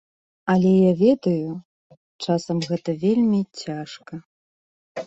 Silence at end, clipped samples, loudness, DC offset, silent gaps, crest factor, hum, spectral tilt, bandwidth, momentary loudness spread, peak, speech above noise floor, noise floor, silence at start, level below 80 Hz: 0 s; under 0.1%; -21 LUFS; under 0.1%; 1.65-1.90 s, 1.97-2.19 s, 4.25-4.95 s; 16 dB; none; -7.5 dB/octave; 8 kHz; 20 LU; -6 dBFS; over 70 dB; under -90 dBFS; 0.45 s; -62 dBFS